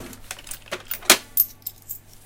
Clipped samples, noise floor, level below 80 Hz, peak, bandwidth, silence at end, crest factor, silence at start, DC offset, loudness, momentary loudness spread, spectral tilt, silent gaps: under 0.1%; -40 dBFS; -50 dBFS; 0 dBFS; 17 kHz; 0.3 s; 26 dB; 0 s; under 0.1%; -19 LUFS; 20 LU; 0 dB/octave; none